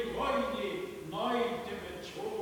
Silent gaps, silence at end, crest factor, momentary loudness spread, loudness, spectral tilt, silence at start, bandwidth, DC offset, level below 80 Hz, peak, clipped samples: none; 0 s; 16 dB; 9 LU; -35 LUFS; -5 dB/octave; 0 s; 19 kHz; under 0.1%; -58 dBFS; -20 dBFS; under 0.1%